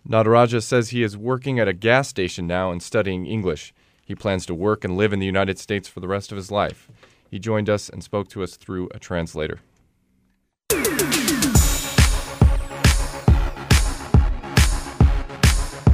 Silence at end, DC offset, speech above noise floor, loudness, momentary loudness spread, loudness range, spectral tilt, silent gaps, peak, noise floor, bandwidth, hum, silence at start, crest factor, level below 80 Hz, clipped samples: 0 s; under 0.1%; 45 dB; -21 LUFS; 11 LU; 8 LU; -5 dB/octave; none; -4 dBFS; -67 dBFS; 16 kHz; none; 0.1 s; 18 dB; -26 dBFS; under 0.1%